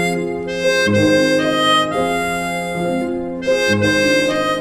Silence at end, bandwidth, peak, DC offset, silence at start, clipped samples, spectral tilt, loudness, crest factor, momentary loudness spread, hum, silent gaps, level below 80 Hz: 0 s; 15.5 kHz; -2 dBFS; under 0.1%; 0 s; under 0.1%; -4.5 dB/octave; -16 LUFS; 14 dB; 8 LU; none; none; -46 dBFS